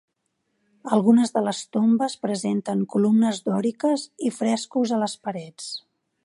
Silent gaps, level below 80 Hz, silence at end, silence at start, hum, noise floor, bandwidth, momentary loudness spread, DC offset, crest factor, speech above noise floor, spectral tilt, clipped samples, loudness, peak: none; -74 dBFS; 0.45 s; 0.85 s; none; -75 dBFS; 11.5 kHz; 14 LU; under 0.1%; 18 dB; 53 dB; -5.5 dB/octave; under 0.1%; -23 LUFS; -4 dBFS